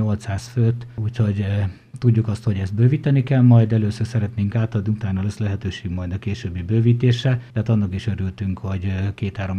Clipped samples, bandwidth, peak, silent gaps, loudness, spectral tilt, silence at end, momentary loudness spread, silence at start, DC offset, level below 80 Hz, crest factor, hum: under 0.1%; 8.8 kHz; -2 dBFS; none; -21 LUFS; -8 dB/octave; 0 s; 10 LU; 0 s; under 0.1%; -46 dBFS; 16 dB; none